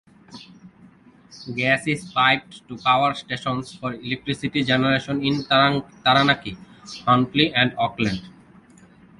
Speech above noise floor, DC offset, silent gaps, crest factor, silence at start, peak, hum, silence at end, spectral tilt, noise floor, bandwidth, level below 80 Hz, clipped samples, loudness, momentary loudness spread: 29 dB; under 0.1%; none; 20 dB; 0.3 s; -2 dBFS; none; 0.9 s; -5.5 dB/octave; -50 dBFS; 11.5 kHz; -54 dBFS; under 0.1%; -21 LUFS; 13 LU